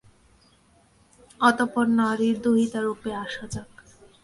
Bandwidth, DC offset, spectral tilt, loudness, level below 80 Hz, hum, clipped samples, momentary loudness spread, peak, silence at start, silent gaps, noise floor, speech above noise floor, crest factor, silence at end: 11.5 kHz; under 0.1%; -5 dB/octave; -24 LUFS; -58 dBFS; none; under 0.1%; 13 LU; -6 dBFS; 1.4 s; none; -60 dBFS; 36 dB; 20 dB; 0.6 s